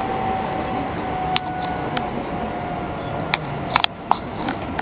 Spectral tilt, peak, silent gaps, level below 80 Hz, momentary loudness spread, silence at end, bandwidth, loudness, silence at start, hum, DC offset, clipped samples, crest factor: -8 dB/octave; 0 dBFS; none; -42 dBFS; 6 LU; 0 s; 5.2 kHz; -24 LUFS; 0 s; none; under 0.1%; under 0.1%; 24 dB